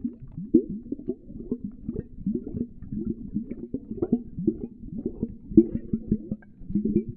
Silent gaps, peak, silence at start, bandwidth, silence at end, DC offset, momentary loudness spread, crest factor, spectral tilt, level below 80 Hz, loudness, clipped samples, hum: none; -2 dBFS; 0 s; 2.5 kHz; 0 s; under 0.1%; 14 LU; 26 dB; -15 dB/octave; -44 dBFS; -29 LUFS; under 0.1%; none